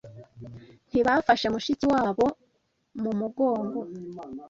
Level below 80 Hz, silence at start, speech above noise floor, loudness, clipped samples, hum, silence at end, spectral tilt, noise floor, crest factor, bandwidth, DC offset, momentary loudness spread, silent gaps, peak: -58 dBFS; 0.05 s; 46 dB; -26 LUFS; under 0.1%; none; 0 s; -5.5 dB/octave; -72 dBFS; 20 dB; 7.6 kHz; under 0.1%; 22 LU; none; -6 dBFS